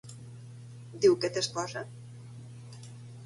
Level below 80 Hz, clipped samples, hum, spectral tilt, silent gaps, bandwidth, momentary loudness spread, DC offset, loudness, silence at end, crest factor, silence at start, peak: -70 dBFS; under 0.1%; none; -4.5 dB/octave; none; 11.5 kHz; 22 LU; under 0.1%; -29 LUFS; 0 s; 22 dB; 0.05 s; -12 dBFS